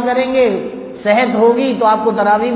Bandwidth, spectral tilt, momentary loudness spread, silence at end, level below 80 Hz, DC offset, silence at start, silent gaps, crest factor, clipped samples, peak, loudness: 4 kHz; -9.5 dB/octave; 8 LU; 0 s; -52 dBFS; under 0.1%; 0 s; none; 12 dB; under 0.1%; -2 dBFS; -14 LUFS